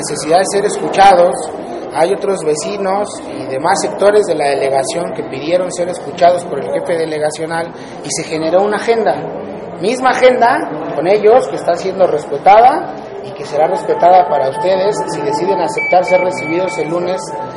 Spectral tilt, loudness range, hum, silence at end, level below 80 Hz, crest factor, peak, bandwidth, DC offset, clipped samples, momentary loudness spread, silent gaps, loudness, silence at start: -4 dB/octave; 5 LU; none; 0 s; -52 dBFS; 14 dB; 0 dBFS; 11.5 kHz; under 0.1%; under 0.1%; 12 LU; none; -13 LUFS; 0 s